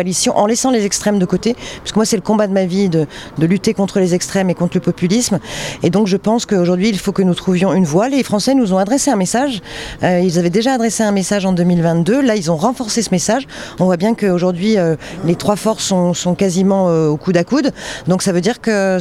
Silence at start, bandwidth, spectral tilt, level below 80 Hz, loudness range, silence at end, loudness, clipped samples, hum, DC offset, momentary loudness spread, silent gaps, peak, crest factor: 0 s; 14.5 kHz; -5 dB/octave; -44 dBFS; 1 LU; 0 s; -15 LUFS; under 0.1%; none; under 0.1%; 5 LU; none; 0 dBFS; 14 dB